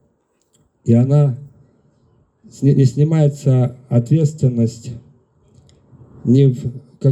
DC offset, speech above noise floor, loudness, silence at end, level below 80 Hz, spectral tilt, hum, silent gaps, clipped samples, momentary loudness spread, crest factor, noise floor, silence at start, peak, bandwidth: under 0.1%; 48 dB; -16 LUFS; 0 s; -56 dBFS; -9 dB/octave; none; none; under 0.1%; 15 LU; 14 dB; -63 dBFS; 0.85 s; -2 dBFS; 8.6 kHz